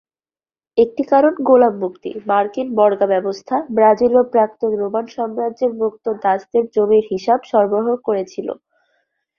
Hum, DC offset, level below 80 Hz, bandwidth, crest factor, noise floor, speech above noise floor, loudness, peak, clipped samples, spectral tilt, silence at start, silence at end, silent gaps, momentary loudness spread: none; under 0.1%; -60 dBFS; 6.8 kHz; 16 dB; under -90 dBFS; over 74 dB; -17 LUFS; -2 dBFS; under 0.1%; -7 dB/octave; 0.75 s; 0.85 s; none; 9 LU